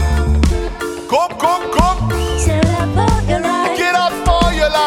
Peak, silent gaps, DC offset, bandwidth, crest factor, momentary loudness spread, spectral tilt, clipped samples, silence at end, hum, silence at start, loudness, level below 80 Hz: 0 dBFS; none; under 0.1%; 16.5 kHz; 14 dB; 4 LU; -5.5 dB/octave; under 0.1%; 0 s; none; 0 s; -15 LUFS; -20 dBFS